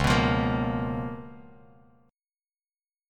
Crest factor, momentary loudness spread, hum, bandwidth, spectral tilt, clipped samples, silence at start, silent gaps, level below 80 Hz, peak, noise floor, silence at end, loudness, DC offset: 20 dB; 18 LU; none; 16.5 kHz; -6 dB/octave; under 0.1%; 0 s; none; -42 dBFS; -8 dBFS; under -90 dBFS; 1.65 s; -27 LUFS; under 0.1%